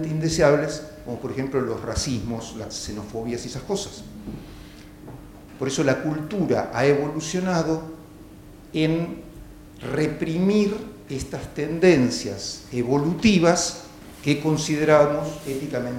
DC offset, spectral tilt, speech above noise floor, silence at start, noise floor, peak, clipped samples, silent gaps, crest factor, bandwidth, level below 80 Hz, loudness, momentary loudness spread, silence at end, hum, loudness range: under 0.1%; -5.5 dB/octave; 21 dB; 0 s; -44 dBFS; -4 dBFS; under 0.1%; none; 20 dB; 17 kHz; -46 dBFS; -23 LUFS; 20 LU; 0 s; none; 8 LU